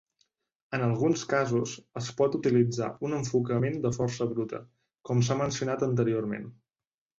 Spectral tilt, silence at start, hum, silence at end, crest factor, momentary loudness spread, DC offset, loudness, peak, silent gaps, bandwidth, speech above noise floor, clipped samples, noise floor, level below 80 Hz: -6.5 dB/octave; 0.7 s; none; 0.65 s; 18 dB; 11 LU; under 0.1%; -29 LUFS; -12 dBFS; none; 7.8 kHz; over 62 dB; under 0.1%; under -90 dBFS; -62 dBFS